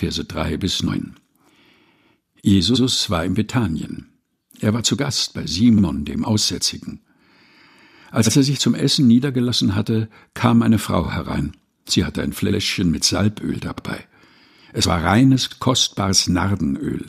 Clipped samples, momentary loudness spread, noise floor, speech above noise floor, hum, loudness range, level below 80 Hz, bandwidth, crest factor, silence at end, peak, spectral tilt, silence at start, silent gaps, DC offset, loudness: under 0.1%; 12 LU; -59 dBFS; 41 dB; none; 3 LU; -42 dBFS; 15.5 kHz; 18 dB; 0 s; -2 dBFS; -4.5 dB/octave; 0 s; none; under 0.1%; -19 LUFS